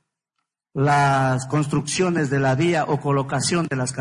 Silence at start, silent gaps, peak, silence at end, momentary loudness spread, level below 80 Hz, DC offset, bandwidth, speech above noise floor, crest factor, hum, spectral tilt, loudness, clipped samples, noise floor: 0.75 s; none; -8 dBFS; 0 s; 5 LU; -54 dBFS; under 0.1%; 11 kHz; 59 dB; 12 dB; none; -5.5 dB/octave; -21 LUFS; under 0.1%; -79 dBFS